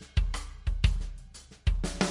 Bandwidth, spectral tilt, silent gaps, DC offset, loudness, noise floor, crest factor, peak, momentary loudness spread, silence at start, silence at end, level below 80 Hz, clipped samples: 11.5 kHz; -5 dB/octave; none; under 0.1%; -32 LUFS; -49 dBFS; 20 dB; -10 dBFS; 15 LU; 0 s; 0 s; -32 dBFS; under 0.1%